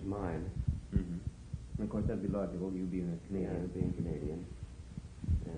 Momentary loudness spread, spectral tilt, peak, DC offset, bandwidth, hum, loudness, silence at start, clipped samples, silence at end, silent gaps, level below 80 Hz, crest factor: 11 LU; -9 dB/octave; -18 dBFS; under 0.1%; 10 kHz; none; -39 LUFS; 0 s; under 0.1%; 0 s; none; -46 dBFS; 18 dB